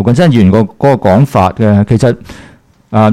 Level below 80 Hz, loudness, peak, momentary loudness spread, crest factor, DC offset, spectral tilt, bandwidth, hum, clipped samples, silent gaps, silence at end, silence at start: -38 dBFS; -9 LUFS; 0 dBFS; 5 LU; 8 dB; under 0.1%; -8 dB/octave; 13.5 kHz; none; under 0.1%; none; 0 s; 0 s